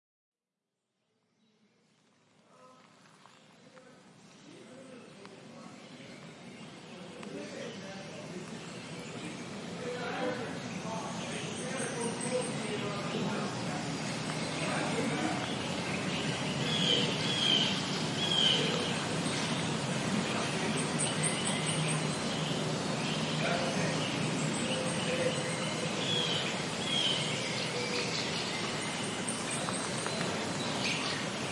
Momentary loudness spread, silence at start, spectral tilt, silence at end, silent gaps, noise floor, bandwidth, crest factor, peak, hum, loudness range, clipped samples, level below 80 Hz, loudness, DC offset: 17 LU; 2.6 s; -3.5 dB/octave; 0 s; none; -89 dBFS; 11.5 kHz; 18 dB; -16 dBFS; none; 16 LU; under 0.1%; -70 dBFS; -32 LUFS; under 0.1%